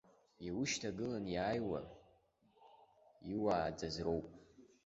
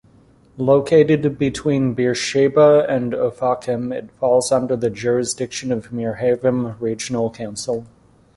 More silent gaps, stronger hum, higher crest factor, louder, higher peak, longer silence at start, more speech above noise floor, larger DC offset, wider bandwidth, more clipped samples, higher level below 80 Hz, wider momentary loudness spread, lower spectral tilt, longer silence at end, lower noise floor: neither; neither; about the same, 20 dB vs 16 dB; second, -40 LUFS vs -19 LUFS; second, -22 dBFS vs -2 dBFS; second, 0.4 s vs 0.55 s; about the same, 33 dB vs 33 dB; neither; second, 7.6 kHz vs 11.5 kHz; neither; second, -64 dBFS vs -52 dBFS; first, 14 LU vs 11 LU; about the same, -4.5 dB/octave vs -5.5 dB/octave; second, 0.2 s vs 0.5 s; first, -73 dBFS vs -51 dBFS